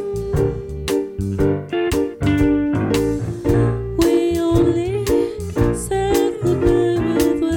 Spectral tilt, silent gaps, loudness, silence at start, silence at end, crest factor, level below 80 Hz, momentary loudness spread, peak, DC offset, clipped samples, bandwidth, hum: -6.5 dB/octave; none; -19 LUFS; 0 s; 0 s; 14 dB; -32 dBFS; 6 LU; -4 dBFS; under 0.1%; under 0.1%; 17.5 kHz; none